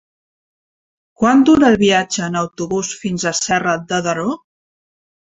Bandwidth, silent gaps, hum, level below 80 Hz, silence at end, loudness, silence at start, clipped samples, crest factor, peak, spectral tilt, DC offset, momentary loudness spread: 8.2 kHz; none; none; -50 dBFS; 1 s; -16 LUFS; 1.2 s; under 0.1%; 16 dB; -2 dBFS; -4 dB/octave; under 0.1%; 11 LU